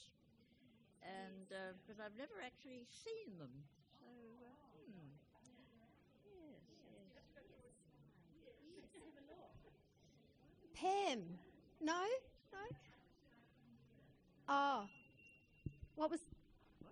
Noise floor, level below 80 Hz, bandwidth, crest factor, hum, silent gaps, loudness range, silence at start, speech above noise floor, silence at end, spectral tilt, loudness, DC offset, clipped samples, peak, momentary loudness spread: -73 dBFS; -76 dBFS; 9.6 kHz; 22 dB; none; none; 19 LU; 0 s; 27 dB; 0 s; -4.5 dB/octave; -47 LUFS; under 0.1%; under 0.1%; -28 dBFS; 27 LU